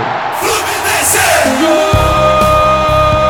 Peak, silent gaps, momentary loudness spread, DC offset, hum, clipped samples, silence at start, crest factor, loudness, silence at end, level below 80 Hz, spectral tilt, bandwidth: 0 dBFS; none; 5 LU; 0.4%; none; under 0.1%; 0 s; 10 dB; -10 LUFS; 0 s; -24 dBFS; -3.5 dB/octave; 18 kHz